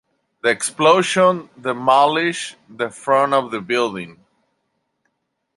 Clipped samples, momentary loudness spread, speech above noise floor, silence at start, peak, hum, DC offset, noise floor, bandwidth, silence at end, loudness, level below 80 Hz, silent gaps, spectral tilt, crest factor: under 0.1%; 13 LU; 55 dB; 0.45 s; -2 dBFS; none; under 0.1%; -73 dBFS; 11.5 kHz; 1.45 s; -18 LUFS; -68 dBFS; none; -3.5 dB/octave; 18 dB